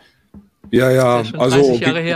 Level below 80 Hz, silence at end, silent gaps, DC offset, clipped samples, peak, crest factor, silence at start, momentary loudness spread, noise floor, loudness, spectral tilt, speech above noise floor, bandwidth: -50 dBFS; 0 s; none; under 0.1%; under 0.1%; -2 dBFS; 14 dB; 0.35 s; 4 LU; -45 dBFS; -14 LUFS; -6 dB/octave; 32 dB; 15.5 kHz